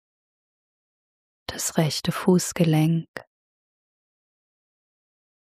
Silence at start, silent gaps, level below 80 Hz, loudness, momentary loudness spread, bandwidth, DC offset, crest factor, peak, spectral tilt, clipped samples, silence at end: 1.5 s; 3.08-3.14 s; -60 dBFS; -23 LUFS; 19 LU; 15.5 kHz; under 0.1%; 22 dB; -4 dBFS; -5.5 dB/octave; under 0.1%; 2.3 s